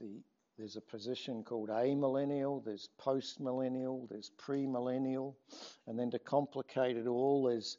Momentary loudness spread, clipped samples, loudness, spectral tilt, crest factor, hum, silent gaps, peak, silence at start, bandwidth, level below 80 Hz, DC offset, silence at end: 15 LU; under 0.1%; -37 LUFS; -5.5 dB/octave; 18 dB; none; none; -20 dBFS; 0 s; 7.6 kHz; -90 dBFS; under 0.1%; 0.05 s